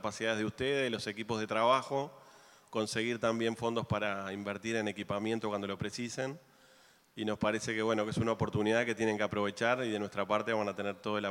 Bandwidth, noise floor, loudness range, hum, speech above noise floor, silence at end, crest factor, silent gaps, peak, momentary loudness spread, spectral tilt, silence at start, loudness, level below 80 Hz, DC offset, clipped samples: 16.5 kHz; -63 dBFS; 4 LU; none; 30 dB; 0 s; 20 dB; none; -14 dBFS; 7 LU; -5 dB/octave; 0 s; -34 LUFS; -68 dBFS; under 0.1%; under 0.1%